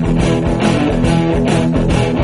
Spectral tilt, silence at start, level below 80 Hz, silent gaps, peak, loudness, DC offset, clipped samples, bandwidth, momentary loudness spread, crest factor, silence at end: -7 dB/octave; 0 s; -24 dBFS; none; 0 dBFS; -14 LUFS; under 0.1%; under 0.1%; 11.5 kHz; 1 LU; 12 dB; 0 s